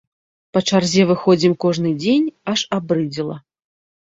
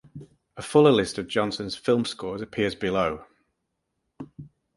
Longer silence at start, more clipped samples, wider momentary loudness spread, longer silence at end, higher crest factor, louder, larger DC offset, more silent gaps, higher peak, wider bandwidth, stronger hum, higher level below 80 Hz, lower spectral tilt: first, 0.55 s vs 0.15 s; neither; second, 9 LU vs 24 LU; first, 0.65 s vs 0.3 s; second, 16 dB vs 22 dB; first, -18 LUFS vs -24 LUFS; neither; neither; about the same, -2 dBFS vs -4 dBFS; second, 8 kHz vs 11.5 kHz; neither; about the same, -58 dBFS vs -56 dBFS; about the same, -5.5 dB/octave vs -5.5 dB/octave